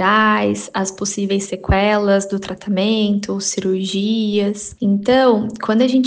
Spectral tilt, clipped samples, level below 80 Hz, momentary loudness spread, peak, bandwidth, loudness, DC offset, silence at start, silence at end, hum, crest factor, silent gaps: -4.5 dB/octave; under 0.1%; -36 dBFS; 8 LU; -4 dBFS; 10 kHz; -17 LUFS; under 0.1%; 0 s; 0 s; none; 14 dB; none